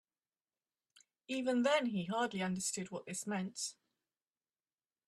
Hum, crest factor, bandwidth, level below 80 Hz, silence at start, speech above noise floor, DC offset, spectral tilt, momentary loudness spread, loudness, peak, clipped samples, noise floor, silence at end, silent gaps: none; 20 dB; 13.5 kHz; -80 dBFS; 1.3 s; over 53 dB; under 0.1%; -4 dB/octave; 10 LU; -37 LUFS; -20 dBFS; under 0.1%; under -90 dBFS; 1.35 s; none